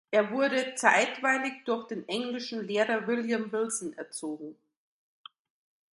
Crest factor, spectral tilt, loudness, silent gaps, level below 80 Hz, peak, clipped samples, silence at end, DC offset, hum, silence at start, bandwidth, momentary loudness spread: 24 dB; -3 dB/octave; -29 LUFS; none; -80 dBFS; -6 dBFS; under 0.1%; 1.4 s; under 0.1%; none; 0.1 s; 11.5 kHz; 13 LU